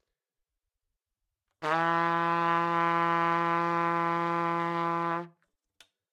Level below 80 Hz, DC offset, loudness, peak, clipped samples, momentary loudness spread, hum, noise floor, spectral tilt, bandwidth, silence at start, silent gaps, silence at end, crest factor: -84 dBFS; under 0.1%; -28 LUFS; -14 dBFS; under 0.1%; 5 LU; none; -87 dBFS; -6.5 dB/octave; 11 kHz; 1.6 s; none; 0.85 s; 18 dB